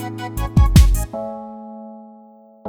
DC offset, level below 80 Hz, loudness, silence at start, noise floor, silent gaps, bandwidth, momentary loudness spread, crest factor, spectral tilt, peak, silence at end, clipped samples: under 0.1%; -20 dBFS; -17 LUFS; 0 s; -46 dBFS; none; 18 kHz; 23 LU; 18 dB; -6 dB/octave; 0 dBFS; 0 s; under 0.1%